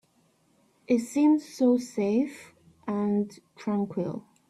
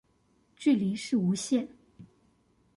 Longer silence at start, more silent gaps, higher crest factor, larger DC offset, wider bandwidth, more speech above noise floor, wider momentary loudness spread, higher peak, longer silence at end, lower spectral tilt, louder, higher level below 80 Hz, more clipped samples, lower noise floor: first, 0.9 s vs 0.6 s; neither; about the same, 16 dB vs 16 dB; neither; first, 13 kHz vs 11.5 kHz; about the same, 40 dB vs 41 dB; first, 13 LU vs 4 LU; about the same, -12 dBFS vs -14 dBFS; second, 0.3 s vs 0.7 s; first, -7 dB/octave vs -5.5 dB/octave; about the same, -27 LUFS vs -29 LUFS; about the same, -72 dBFS vs -70 dBFS; neither; about the same, -66 dBFS vs -68 dBFS